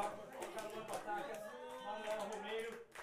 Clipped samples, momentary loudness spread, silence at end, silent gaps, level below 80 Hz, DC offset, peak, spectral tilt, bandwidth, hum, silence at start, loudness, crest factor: under 0.1%; 6 LU; 0 s; none; -76 dBFS; under 0.1%; -26 dBFS; -3 dB/octave; 15.5 kHz; none; 0 s; -46 LUFS; 20 dB